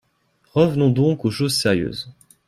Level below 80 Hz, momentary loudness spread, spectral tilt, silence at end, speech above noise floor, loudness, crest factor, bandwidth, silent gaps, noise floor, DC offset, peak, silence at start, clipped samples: -52 dBFS; 12 LU; -6 dB/octave; 0.35 s; 45 dB; -19 LUFS; 18 dB; 15 kHz; none; -64 dBFS; under 0.1%; -4 dBFS; 0.55 s; under 0.1%